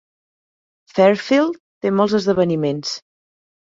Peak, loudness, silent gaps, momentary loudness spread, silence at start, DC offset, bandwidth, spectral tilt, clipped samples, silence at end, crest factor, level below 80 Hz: -2 dBFS; -18 LUFS; 1.60-1.81 s; 11 LU; 0.95 s; under 0.1%; 7.8 kHz; -6 dB/octave; under 0.1%; 0.65 s; 18 dB; -60 dBFS